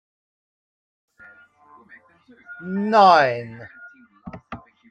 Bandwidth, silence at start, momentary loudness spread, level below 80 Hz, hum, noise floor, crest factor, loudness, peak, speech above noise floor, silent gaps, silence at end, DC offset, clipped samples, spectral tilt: 9 kHz; 2.5 s; 28 LU; -64 dBFS; none; -52 dBFS; 20 dB; -17 LUFS; -2 dBFS; 34 dB; none; 0.35 s; under 0.1%; under 0.1%; -6 dB/octave